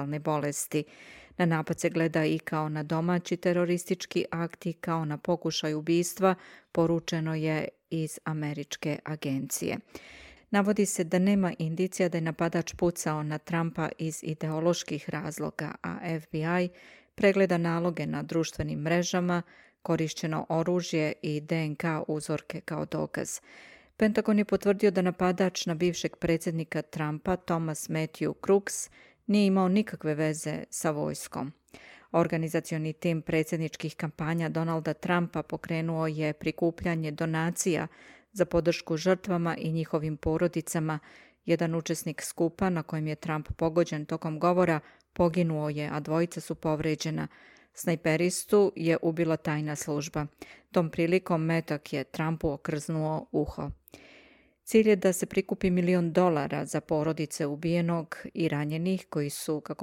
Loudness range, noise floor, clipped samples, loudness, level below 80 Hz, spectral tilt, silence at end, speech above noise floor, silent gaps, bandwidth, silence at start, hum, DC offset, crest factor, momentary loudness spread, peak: 3 LU; -59 dBFS; under 0.1%; -29 LUFS; -58 dBFS; -5.5 dB/octave; 0 s; 30 dB; none; 16.5 kHz; 0 s; none; under 0.1%; 18 dB; 9 LU; -10 dBFS